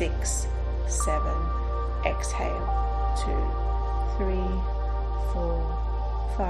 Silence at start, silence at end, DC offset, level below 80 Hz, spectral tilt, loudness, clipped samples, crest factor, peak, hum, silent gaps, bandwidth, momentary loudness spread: 0 s; 0 s; under 0.1%; -26 dBFS; -5.5 dB/octave; -29 LUFS; under 0.1%; 16 dB; -10 dBFS; none; none; 12 kHz; 3 LU